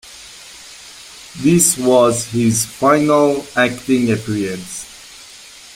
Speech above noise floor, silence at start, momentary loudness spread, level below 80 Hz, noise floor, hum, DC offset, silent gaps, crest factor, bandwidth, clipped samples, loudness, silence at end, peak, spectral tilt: 24 dB; 0.05 s; 23 LU; -50 dBFS; -39 dBFS; none; under 0.1%; none; 18 dB; 16.5 kHz; under 0.1%; -15 LUFS; 0.4 s; 0 dBFS; -4.5 dB/octave